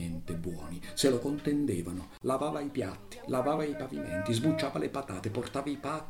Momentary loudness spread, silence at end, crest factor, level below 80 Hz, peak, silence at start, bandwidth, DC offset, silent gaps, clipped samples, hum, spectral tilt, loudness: 10 LU; 0 s; 18 dB; -56 dBFS; -14 dBFS; 0 s; 16.5 kHz; under 0.1%; none; under 0.1%; none; -5.5 dB/octave; -33 LUFS